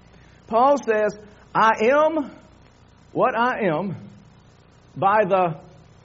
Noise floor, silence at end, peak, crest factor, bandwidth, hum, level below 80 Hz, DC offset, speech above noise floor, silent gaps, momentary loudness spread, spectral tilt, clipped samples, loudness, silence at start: -52 dBFS; 0.45 s; -4 dBFS; 18 dB; 7.6 kHz; none; -60 dBFS; under 0.1%; 32 dB; none; 14 LU; -4 dB/octave; under 0.1%; -21 LUFS; 0.5 s